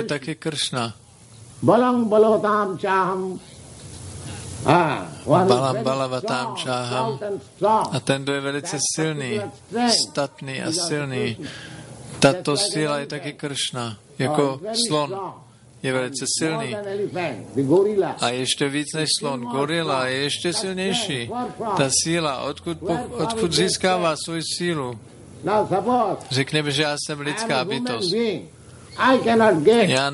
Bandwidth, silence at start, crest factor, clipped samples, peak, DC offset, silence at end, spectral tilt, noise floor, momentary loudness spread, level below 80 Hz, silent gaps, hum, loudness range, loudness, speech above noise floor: 11.5 kHz; 0 s; 22 dB; under 0.1%; -2 dBFS; under 0.1%; 0 s; -4 dB/octave; -46 dBFS; 13 LU; -54 dBFS; none; none; 3 LU; -22 LUFS; 24 dB